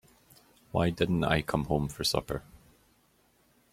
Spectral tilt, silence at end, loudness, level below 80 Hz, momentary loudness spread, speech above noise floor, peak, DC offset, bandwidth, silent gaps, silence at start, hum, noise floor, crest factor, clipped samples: -5 dB/octave; 1.15 s; -30 LUFS; -50 dBFS; 8 LU; 38 dB; -10 dBFS; under 0.1%; 16 kHz; none; 0.75 s; none; -67 dBFS; 24 dB; under 0.1%